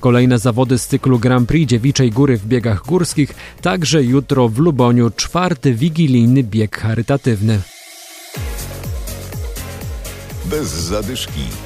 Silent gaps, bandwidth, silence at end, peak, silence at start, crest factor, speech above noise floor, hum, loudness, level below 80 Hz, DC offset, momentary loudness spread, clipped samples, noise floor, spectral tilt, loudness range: none; 15.5 kHz; 0 s; -2 dBFS; 0 s; 14 dB; 22 dB; none; -15 LUFS; -32 dBFS; under 0.1%; 14 LU; under 0.1%; -36 dBFS; -6 dB/octave; 10 LU